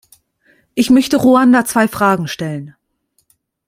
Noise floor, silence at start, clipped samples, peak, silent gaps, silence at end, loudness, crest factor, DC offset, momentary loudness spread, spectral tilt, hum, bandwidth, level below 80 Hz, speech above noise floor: -64 dBFS; 0.75 s; under 0.1%; -2 dBFS; none; 1 s; -13 LUFS; 14 dB; under 0.1%; 14 LU; -5 dB/octave; none; 16 kHz; -52 dBFS; 51 dB